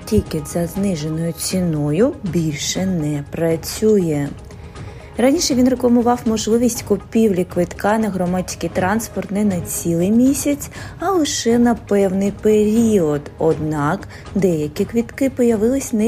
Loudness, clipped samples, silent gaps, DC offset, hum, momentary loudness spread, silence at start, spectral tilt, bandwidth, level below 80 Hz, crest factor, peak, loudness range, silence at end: -18 LUFS; under 0.1%; none; under 0.1%; none; 8 LU; 0 s; -5.5 dB/octave; 15.5 kHz; -40 dBFS; 14 dB; -2 dBFS; 3 LU; 0 s